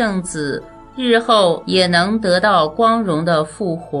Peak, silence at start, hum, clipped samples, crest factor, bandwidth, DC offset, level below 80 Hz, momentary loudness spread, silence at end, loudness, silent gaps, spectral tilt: 0 dBFS; 0 s; none; under 0.1%; 16 dB; 11 kHz; under 0.1%; -46 dBFS; 10 LU; 0 s; -16 LUFS; none; -5 dB/octave